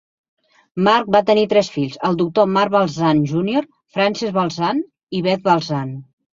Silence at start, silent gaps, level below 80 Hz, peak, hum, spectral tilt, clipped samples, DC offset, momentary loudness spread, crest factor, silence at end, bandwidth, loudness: 0.75 s; 5.03-5.07 s; -58 dBFS; 0 dBFS; none; -6.5 dB/octave; under 0.1%; under 0.1%; 10 LU; 18 dB; 0.3 s; 7.6 kHz; -18 LUFS